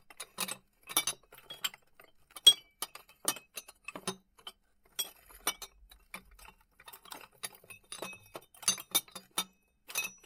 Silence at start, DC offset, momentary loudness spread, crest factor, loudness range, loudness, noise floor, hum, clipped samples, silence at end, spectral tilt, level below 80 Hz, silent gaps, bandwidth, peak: 0.2 s; under 0.1%; 20 LU; 32 dB; 12 LU; -32 LUFS; -62 dBFS; none; under 0.1%; 0.15 s; 1 dB/octave; -70 dBFS; none; 17.5 kHz; -6 dBFS